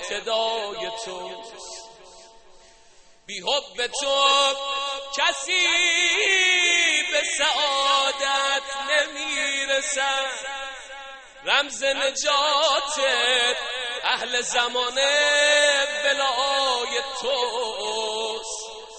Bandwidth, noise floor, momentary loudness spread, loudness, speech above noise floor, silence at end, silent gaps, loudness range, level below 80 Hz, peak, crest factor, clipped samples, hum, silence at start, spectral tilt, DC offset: 8.8 kHz; -52 dBFS; 15 LU; -21 LUFS; 29 dB; 0 s; none; 6 LU; -60 dBFS; -6 dBFS; 18 dB; under 0.1%; none; 0 s; 1.5 dB/octave; under 0.1%